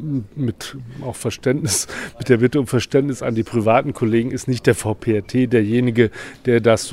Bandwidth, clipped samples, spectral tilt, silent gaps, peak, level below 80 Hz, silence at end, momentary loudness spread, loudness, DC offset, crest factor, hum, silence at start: 16 kHz; under 0.1%; -5.5 dB/octave; none; 0 dBFS; -48 dBFS; 0 s; 10 LU; -19 LUFS; under 0.1%; 18 dB; none; 0 s